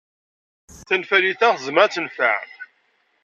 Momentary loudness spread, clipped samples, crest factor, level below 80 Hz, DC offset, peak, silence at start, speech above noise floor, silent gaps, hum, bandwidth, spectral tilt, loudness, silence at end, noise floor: 10 LU; under 0.1%; 20 dB; -62 dBFS; under 0.1%; -2 dBFS; 0.75 s; 46 dB; none; none; 8.8 kHz; -3 dB/octave; -19 LUFS; 0.6 s; -65 dBFS